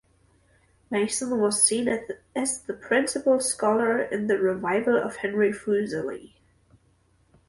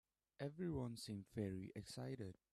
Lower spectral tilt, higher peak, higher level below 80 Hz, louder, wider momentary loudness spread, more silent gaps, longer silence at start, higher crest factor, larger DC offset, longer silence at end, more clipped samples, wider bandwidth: second, -3 dB/octave vs -6.5 dB/octave; first, -6 dBFS vs -34 dBFS; first, -64 dBFS vs -72 dBFS; first, -25 LUFS vs -49 LUFS; first, 10 LU vs 6 LU; neither; first, 0.9 s vs 0.4 s; about the same, 20 dB vs 16 dB; neither; first, 1.2 s vs 0.2 s; neither; second, 11.5 kHz vs 14 kHz